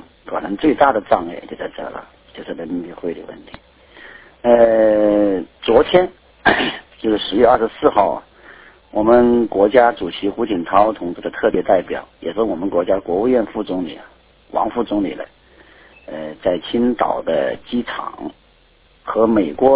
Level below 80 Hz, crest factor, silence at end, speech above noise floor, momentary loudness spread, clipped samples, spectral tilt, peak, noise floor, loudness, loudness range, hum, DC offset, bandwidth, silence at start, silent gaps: -46 dBFS; 18 dB; 0 s; 36 dB; 17 LU; under 0.1%; -9.5 dB/octave; 0 dBFS; -53 dBFS; -17 LUFS; 7 LU; none; under 0.1%; 4 kHz; 0.25 s; none